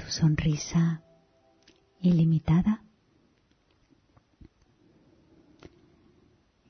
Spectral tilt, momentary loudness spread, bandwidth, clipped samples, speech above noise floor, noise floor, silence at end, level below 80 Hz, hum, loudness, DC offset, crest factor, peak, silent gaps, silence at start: -6.5 dB/octave; 6 LU; 6.6 kHz; under 0.1%; 43 dB; -67 dBFS; 3.95 s; -50 dBFS; none; -26 LUFS; under 0.1%; 16 dB; -14 dBFS; none; 0 s